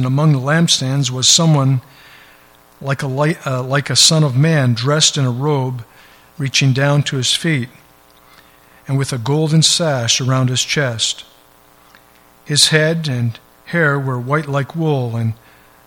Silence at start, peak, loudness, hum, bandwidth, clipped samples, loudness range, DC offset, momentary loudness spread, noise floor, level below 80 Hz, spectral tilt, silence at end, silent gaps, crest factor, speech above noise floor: 0 s; 0 dBFS; -15 LUFS; none; 16.5 kHz; under 0.1%; 3 LU; under 0.1%; 11 LU; -48 dBFS; -56 dBFS; -4 dB/octave; 0.5 s; none; 16 dB; 33 dB